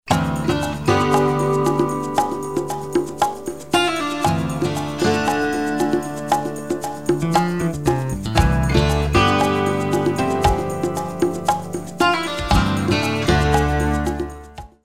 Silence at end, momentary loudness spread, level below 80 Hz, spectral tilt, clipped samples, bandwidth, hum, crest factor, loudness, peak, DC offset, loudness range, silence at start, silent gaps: 0 s; 7 LU; -30 dBFS; -5.5 dB/octave; under 0.1%; 16.5 kHz; none; 18 dB; -20 LUFS; -2 dBFS; 0.8%; 3 LU; 0 s; none